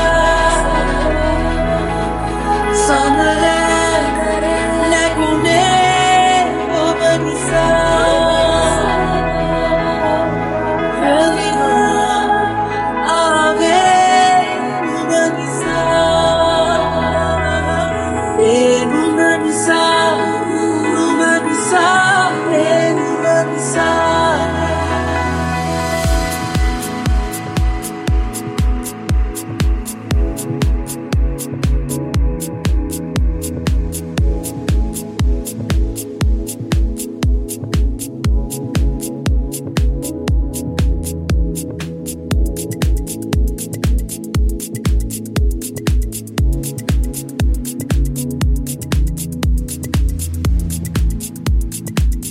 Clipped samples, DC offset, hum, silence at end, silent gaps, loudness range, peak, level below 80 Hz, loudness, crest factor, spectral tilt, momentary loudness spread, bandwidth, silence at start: under 0.1%; under 0.1%; none; 0 s; none; 6 LU; 0 dBFS; -22 dBFS; -16 LUFS; 14 dB; -5 dB/octave; 9 LU; 16 kHz; 0 s